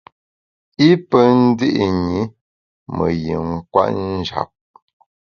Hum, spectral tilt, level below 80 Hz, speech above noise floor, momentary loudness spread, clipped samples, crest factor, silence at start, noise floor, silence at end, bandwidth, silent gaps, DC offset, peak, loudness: none; -7.5 dB/octave; -42 dBFS; over 74 dB; 14 LU; under 0.1%; 18 dB; 0.8 s; under -90 dBFS; 0.85 s; 6.8 kHz; 2.41-2.86 s; under 0.1%; 0 dBFS; -17 LUFS